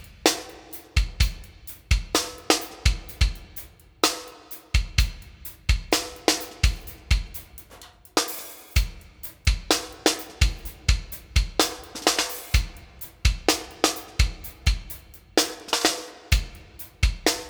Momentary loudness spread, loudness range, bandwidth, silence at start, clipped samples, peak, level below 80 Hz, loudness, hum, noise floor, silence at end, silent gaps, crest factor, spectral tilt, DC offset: 17 LU; 2 LU; over 20 kHz; 0 s; under 0.1%; -2 dBFS; -28 dBFS; -25 LUFS; none; -48 dBFS; 0 s; none; 24 dB; -3 dB/octave; under 0.1%